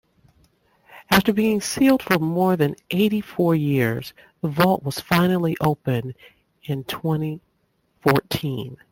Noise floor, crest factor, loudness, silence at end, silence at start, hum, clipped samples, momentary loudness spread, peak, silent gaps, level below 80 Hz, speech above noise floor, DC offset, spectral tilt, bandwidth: -68 dBFS; 20 dB; -21 LUFS; 0.15 s; 0.9 s; none; under 0.1%; 12 LU; -2 dBFS; none; -52 dBFS; 47 dB; under 0.1%; -6 dB/octave; 17 kHz